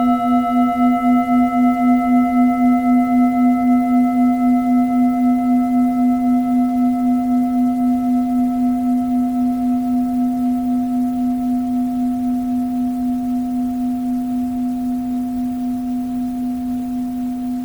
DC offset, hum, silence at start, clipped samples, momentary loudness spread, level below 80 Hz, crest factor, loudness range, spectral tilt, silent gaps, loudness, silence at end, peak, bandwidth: 0.1%; none; 0 s; under 0.1%; 7 LU; -46 dBFS; 12 dB; 6 LU; -7 dB/octave; none; -17 LUFS; 0 s; -4 dBFS; 19.5 kHz